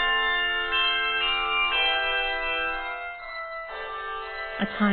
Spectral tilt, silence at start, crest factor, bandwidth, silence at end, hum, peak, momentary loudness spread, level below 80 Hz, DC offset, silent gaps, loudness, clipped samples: -7 dB/octave; 0 s; 14 dB; 4.7 kHz; 0 s; none; -12 dBFS; 12 LU; -48 dBFS; under 0.1%; none; -25 LUFS; under 0.1%